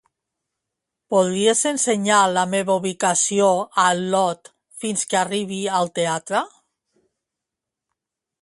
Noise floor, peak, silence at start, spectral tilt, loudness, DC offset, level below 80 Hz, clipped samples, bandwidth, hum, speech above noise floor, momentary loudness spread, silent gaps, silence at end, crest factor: -85 dBFS; -2 dBFS; 1.1 s; -3 dB/octave; -20 LUFS; under 0.1%; -68 dBFS; under 0.1%; 11.5 kHz; none; 65 dB; 8 LU; none; 1.95 s; 20 dB